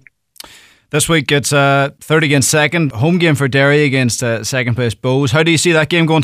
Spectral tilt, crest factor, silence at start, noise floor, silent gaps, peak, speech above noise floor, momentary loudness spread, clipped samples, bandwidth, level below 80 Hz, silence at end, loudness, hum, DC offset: -4.5 dB/octave; 12 dB; 0.95 s; -42 dBFS; none; -2 dBFS; 30 dB; 6 LU; under 0.1%; 16 kHz; -48 dBFS; 0 s; -13 LUFS; none; under 0.1%